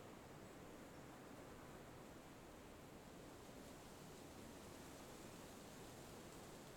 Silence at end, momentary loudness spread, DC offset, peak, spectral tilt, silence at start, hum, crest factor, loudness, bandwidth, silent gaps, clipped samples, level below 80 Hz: 0 s; 2 LU; under 0.1%; -46 dBFS; -4.5 dB/octave; 0 s; none; 14 dB; -58 LUFS; 19 kHz; none; under 0.1%; -72 dBFS